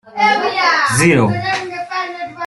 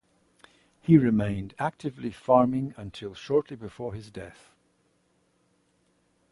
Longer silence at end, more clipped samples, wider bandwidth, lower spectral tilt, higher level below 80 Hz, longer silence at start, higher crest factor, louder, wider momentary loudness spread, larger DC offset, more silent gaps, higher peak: second, 0 s vs 2 s; neither; about the same, 12.5 kHz vs 11.5 kHz; second, -4.5 dB/octave vs -8.5 dB/octave; first, -48 dBFS vs -56 dBFS; second, 0.05 s vs 0.9 s; second, 14 dB vs 22 dB; first, -15 LUFS vs -26 LUFS; second, 11 LU vs 20 LU; neither; neither; first, -2 dBFS vs -6 dBFS